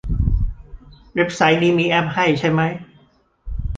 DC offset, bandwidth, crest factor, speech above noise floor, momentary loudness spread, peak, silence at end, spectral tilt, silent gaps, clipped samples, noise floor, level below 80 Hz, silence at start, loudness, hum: under 0.1%; 9 kHz; 18 dB; 38 dB; 14 LU; -2 dBFS; 0 s; -6 dB/octave; none; under 0.1%; -55 dBFS; -28 dBFS; 0.05 s; -18 LUFS; none